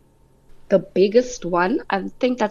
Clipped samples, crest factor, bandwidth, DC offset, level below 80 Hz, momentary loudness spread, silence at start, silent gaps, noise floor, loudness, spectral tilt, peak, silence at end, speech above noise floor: under 0.1%; 16 dB; 7.4 kHz; under 0.1%; -48 dBFS; 6 LU; 0.55 s; none; -54 dBFS; -20 LUFS; -5.5 dB/octave; -4 dBFS; 0 s; 35 dB